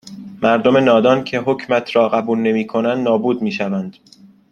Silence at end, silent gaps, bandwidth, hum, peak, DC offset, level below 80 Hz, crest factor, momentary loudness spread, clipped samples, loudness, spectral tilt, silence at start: 0.6 s; none; 9.4 kHz; none; 0 dBFS; under 0.1%; -60 dBFS; 16 dB; 9 LU; under 0.1%; -16 LUFS; -6.5 dB/octave; 0.05 s